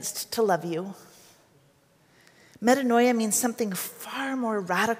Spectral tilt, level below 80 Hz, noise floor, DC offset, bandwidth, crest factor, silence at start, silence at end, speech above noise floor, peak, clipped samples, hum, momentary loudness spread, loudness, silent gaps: -3.5 dB/octave; -76 dBFS; -62 dBFS; under 0.1%; 16 kHz; 20 dB; 0 s; 0 s; 36 dB; -8 dBFS; under 0.1%; none; 12 LU; -26 LUFS; none